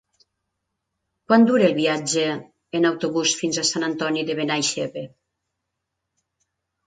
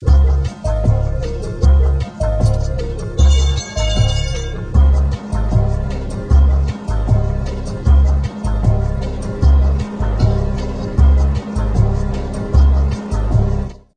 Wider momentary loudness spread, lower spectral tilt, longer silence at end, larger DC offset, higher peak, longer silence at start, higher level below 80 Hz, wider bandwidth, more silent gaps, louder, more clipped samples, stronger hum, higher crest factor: first, 13 LU vs 9 LU; second, -3.5 dB/octave vs -7 dB/octave; first, 1.8 s vs 0.25 s; neither; about the same, -2 dBFS vs -2 dBFS; first, 1.3 s vs 0 s; second, -68 dBFS vs -16 dBFS; about the same, 9.4 kHz vs 9.2 kHz; neither; second, -21 LUFS vs -17 LUFS; neither; neither; first, 20 dB vs 14 dB